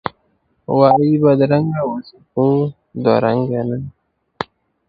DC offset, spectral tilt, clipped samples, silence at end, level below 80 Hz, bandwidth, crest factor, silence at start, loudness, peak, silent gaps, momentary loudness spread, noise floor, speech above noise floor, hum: under 0.1%; -10.5 dB/octave; under 0.1%; 0.45 s; -54 dBFS; 5.2 kHz; 16 dB; 0.05 s; -16 LUFS; 0 dBFS; none; 17 LU; -63 dBFS; 48 dB; none